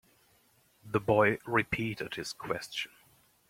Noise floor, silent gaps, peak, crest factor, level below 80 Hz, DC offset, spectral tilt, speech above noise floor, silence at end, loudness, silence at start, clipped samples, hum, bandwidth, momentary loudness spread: -67 dBFS; none; -12 dBFS; 22 dB; -62 dBFS; under 0.1%; -5 dB/octave; 36 dB; 0.65 s; -31 LUFS; 0.85 s; under 0.1%; none; 16.5 kHz; 12 LU